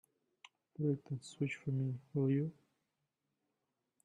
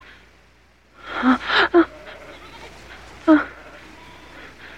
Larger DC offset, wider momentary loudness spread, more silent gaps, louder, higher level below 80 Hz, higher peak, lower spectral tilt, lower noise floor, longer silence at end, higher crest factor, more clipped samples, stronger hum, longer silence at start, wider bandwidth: second, under 0.1% vs 0.2%; second, 9 LU vs 25 LU; neither; second, -39 LUFS vs -19 LUFS; second, -80 dBFS vs -52 dBFS; second, -24 dBFS vs -4 dBFS; first, -8 dB/octave vs -4.5 dB/octave; first, -87 dBFS vs -55 dBFS; first, 1.55 s vs 0 s; about the same, 16 dB vs 20 dB; neither; second, none vs 60 Hz at -50 dBFS; second, 0.8 s vs 1.05 s; about the same, 9.8 kHz vs 9 kHz